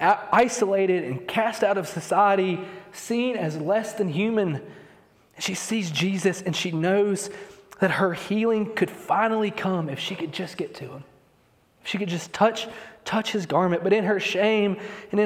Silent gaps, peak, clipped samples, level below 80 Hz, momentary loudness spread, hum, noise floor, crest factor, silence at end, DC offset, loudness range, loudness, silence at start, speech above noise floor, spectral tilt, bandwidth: none; -6 dBFS; under 0.1%; -68 dBFS; 13 LU; none; -61 dBFS; 20 dB; 0 s; under 0.1%; 5 LU; -24 LUFS; 0 s; 37 dB; -5 dB/octave; 15.5 kHz